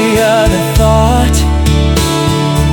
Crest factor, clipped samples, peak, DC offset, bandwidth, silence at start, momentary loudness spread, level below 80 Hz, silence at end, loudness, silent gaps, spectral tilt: 10 dB; under 0.1%; 0 dBFS; under 0.1%; 17.5 kHz; 0 s; 3 LU; -14 dBFS; 0 s; -10 LUFS; none; -5.5 dB/octave